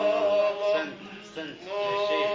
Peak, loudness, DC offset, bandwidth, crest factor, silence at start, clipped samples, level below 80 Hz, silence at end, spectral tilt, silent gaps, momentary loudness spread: -14 dBFS; -27 LUFS; under 0.1%; 7.6 kHz; 12 dB; 0 s; under 0.1%; -72 dBFS; 0 s; -4 dB/octave; none; 15 LU